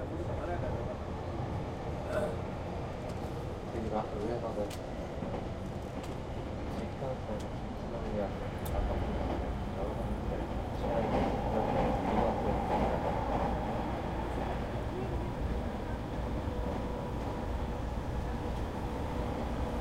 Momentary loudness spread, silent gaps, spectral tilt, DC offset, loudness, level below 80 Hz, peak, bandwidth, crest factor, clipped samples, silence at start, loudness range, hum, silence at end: 8 LU; none; -7.5 dB/octave; under 0.1%; -36 LUFS; -40 dBFS; -18 dBFS; 16 kHz; 18 dB; under 0.1%; 0 s; 6 LU; none; 0 s